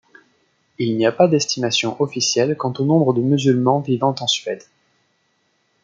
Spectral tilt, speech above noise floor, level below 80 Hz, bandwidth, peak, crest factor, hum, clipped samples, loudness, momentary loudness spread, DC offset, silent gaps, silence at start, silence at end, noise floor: -5 dB/octave; 48 dB; -66 dBFS; 9.4 kHz; -2 dBFS; 18 dB; none; under 0.1%; -18 LUFS; 6 LU; under 0.1%; none; 0.8 s; 1.25 s; -66 dBFS